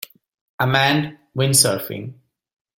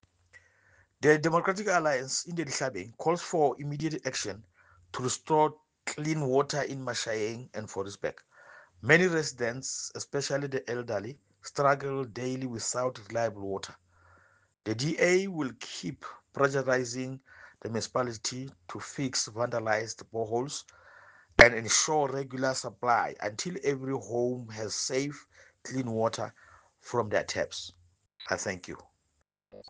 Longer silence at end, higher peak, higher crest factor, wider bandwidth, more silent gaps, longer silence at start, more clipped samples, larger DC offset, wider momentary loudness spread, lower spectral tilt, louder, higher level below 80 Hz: first, 0.65 s vs 0 s; about the same, 0 dBFS vs -2 dBFS; second, 22 dB vs 28 dB; first, 17 kHz vs 10 kHz; neither; first, 0.6 s vs 0.35 s; neither; neither; first, 19 LU vs 15 LU; about the same, -3 dB/octave vs -3.5 dB/octave; first, -18 LUFS vs -30 LUFS; about the same, -56 dBFS vs -58 dBFS